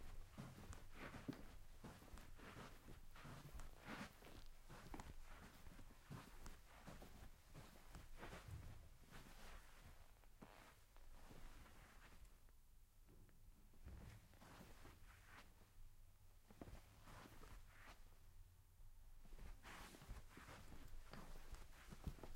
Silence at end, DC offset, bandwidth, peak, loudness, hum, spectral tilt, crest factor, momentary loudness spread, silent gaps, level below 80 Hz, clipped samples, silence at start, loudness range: 0 s; under 0.1%; 16 kHz; -38 dBFS; -62 LUFS; none; -4.5 dB/octave; 20 dB; 9 LU; none; -62 dBFS; under 0.1%; 0 s; 7 LU